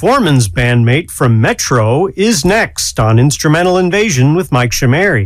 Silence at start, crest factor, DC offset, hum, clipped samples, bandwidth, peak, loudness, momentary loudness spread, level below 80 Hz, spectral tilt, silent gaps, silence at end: 0 s; 10 dB; under 0.1%; none; under 0.1%; 15.5 kHz; 0 dBFS; -11 LUFS; 3 LU; -32 dBFS; -5 dB/octave; none; 0 s